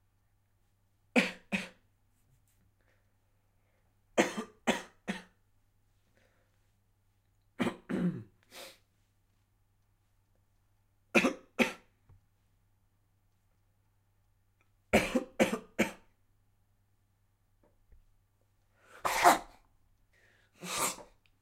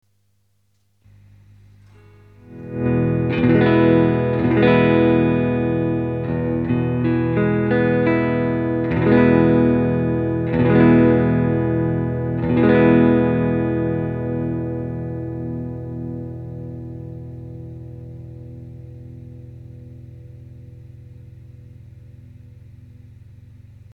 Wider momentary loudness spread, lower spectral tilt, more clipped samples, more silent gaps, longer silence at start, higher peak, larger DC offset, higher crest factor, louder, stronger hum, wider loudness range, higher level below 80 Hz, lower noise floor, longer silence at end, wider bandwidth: second, 19 LU vs 23 LU; second, -4 dB/octave vs -10.5 dB/octave; neither; neither; second, 1.15 s vs 2.5 s; second, -8 dBFS vs -2 dBFS; neither; first, 28 dB vs 18 dB; second, -32 LUFS vs -18 LUFS; second, none vs 50 Hz at -45 dBFS; second, 8 LU vs 20 LU; second, -64 dBFS vs -42 dBFS; first, -73 dBFS vs -65 dBFS; second, 0.4 s vs 1 s; first, 16 kHz vs 4.9 kHz